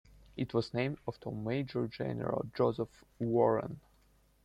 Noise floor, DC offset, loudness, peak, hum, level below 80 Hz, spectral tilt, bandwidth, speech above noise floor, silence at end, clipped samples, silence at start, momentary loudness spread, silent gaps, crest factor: -67 dBFS; under 0.1%; -35 LUFS; -14 dBFS; none; -64 dBFS; -8.5 dB/octave; 11 kHz; 33 dB; 0.65 s; under 0.1%; 0.35 s; 12 LU; none; 20 dB